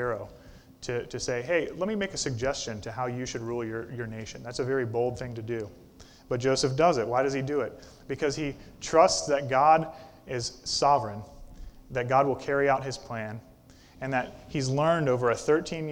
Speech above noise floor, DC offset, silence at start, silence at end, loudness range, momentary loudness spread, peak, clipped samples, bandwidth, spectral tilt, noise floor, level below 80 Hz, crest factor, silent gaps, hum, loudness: 26 dB; under 0.1%; 0 s; 0 s; 6 LU; 14 LU; -8 dBFS; under 0.1%; 17 kHz; -4.5 dB/octave; -54 dBFS; -54 dBFS; 22 dB; none; none; -28 LUFS